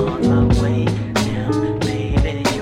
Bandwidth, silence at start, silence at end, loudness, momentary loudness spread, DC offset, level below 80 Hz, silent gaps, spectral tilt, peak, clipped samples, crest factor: 14 kHz; 0 s; 0 s; -18 LUFS; 5 LU; under 0.1%; -26 dBFS; none; -6.5 dB/octave; -4 dBFS; under 0.1%; 14 dB